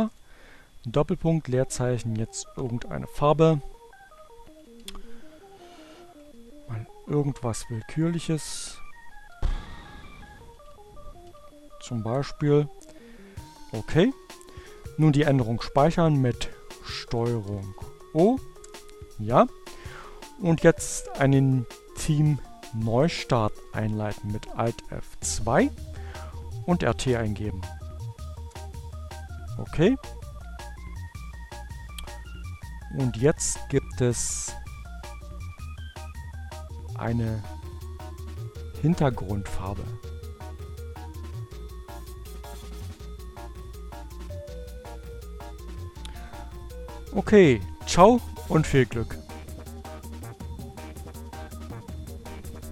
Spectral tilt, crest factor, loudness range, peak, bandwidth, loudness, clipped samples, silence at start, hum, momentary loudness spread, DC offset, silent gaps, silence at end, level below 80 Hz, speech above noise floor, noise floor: -6 dB/octave; 26 dB; 16 LU; -2 dBFS; 16 kHz; -26 LUFS; under 0.1%; 0 s; none; 20 LU; under 0.1%; none; 0 s; -42 dBFS; 26 dB; -50 dBFS